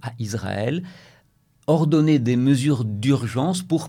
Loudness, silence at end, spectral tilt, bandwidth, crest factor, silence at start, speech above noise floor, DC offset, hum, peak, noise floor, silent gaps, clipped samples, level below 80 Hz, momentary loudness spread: -21 LUFS; 0 s; -7 dB/octave; 15 kHz; 14 dB; 0.05 s; 39 dB; under 0.1%; none; -6 dBFS; -60 dBFS; none; under 0.1%; -60 dBFS; 11 LU